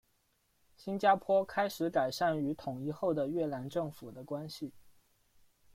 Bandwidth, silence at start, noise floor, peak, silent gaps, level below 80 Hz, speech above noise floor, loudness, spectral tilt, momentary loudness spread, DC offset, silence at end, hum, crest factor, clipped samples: 16.5 kHz; 0.8 s; -75 dBFS; -14 dBFS; none; -70 dBFS; 42 dB; -34 LUFS; -6 dB/octave; 14 LU; under 0.1%; 0.85 s; none; 20 dB; under 0.1%